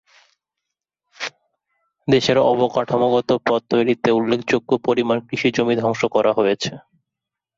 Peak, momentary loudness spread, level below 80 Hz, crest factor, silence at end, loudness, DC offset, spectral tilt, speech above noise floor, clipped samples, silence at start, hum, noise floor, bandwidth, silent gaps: -4 dBFS; 10 LU; -58 dBFS; 16 dB; 0.8 s; -19 LUFS; under 0.1%; -5.5 dB/octave; 66 dB; under 0.1%; 1.2 s; none; -84 dBFS; 7.8 kHz; none